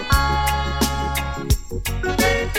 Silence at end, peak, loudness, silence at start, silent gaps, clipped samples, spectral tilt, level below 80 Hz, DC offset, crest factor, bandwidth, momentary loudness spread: 0 s; -6 dBFS; -21 LUFS; 0 s; none; under 0.1%; -4 dB/octave; -26 dBFS; under 0.1%; 16 dB; 17.5 kHz; 6 LU